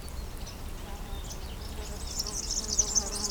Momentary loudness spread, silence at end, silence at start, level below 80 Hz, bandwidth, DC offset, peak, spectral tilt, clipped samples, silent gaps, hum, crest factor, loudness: 16 LU; 0 s; 0 s; -40 dBFS; over 20 kHz; under 0.1%; -12 dBFS; -1.5 dB/octave; under 0.1%; none; none; 22 dB; -32 LUFS